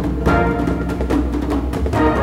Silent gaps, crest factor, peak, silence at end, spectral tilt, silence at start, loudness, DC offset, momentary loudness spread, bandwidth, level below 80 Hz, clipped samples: none; 14 dB; -4 dBFS; 0 s; -7.5 dB/octave; 0 s; -19 LUFS; under 0.1%; 4 LU; 13.5 kHz; -24 dBFS; under 0.1%